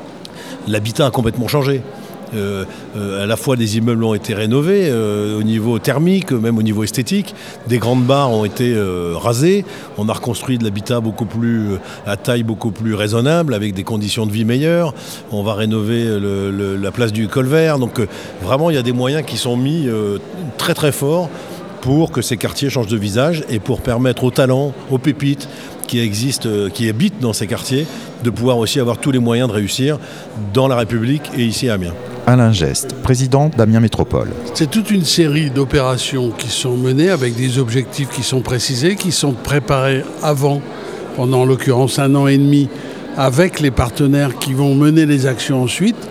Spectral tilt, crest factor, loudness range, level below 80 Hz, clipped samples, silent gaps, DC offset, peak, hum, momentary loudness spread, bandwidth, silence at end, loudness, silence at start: -5.5 dB/octave; 16 dB; 4 LU; -40 dBFS; under 0.1%; none; 0.2%; 0 dBFS; none; 8 LU; 16 kHz; 0 s; -16 LUFS; 0 s